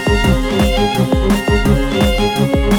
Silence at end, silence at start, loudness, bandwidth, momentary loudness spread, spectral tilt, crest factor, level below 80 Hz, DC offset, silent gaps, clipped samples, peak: 0 s; 0 s; -14 LUFS; 20 kHz; 1 LU; -6 dB/octave; 12 dB; -20 dBFS; under 0.1%; none; under 0.1%; -2 dBFS